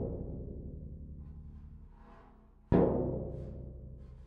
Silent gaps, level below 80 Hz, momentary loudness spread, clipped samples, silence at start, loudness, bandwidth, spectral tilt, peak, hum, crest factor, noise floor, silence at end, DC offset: none; -46 dBFS; 25 LU; under 0.1%; 0 s; -35 LUFS; 4.5 kHz; -12 dB/octave; -14 dBFS; none; 24 dB; -59 dBFS; 0 s; under 0.1%